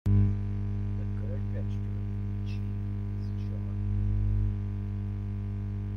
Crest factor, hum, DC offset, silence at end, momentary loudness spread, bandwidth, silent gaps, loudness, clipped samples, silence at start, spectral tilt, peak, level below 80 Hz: 16 dB; 50 Hz at -30 dBFS; under 0.1%; 0 s; 5 LU; 5.2 kHz; none; -33 LUFS; under 0.1%; 0.05 s; -10 dB/octave; -14 dBFS; -36 dBFS